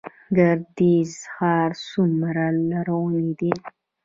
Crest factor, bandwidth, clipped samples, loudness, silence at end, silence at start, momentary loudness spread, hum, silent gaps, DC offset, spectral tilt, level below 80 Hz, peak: 18 dB; 7.8 kHz; under 0.1%; -22 LUFS; 0.35 s; 0.05 s; 6 LU; none; none; under 0.1%; -7.5 dB/octave; -62 dBFS; -4 dBFS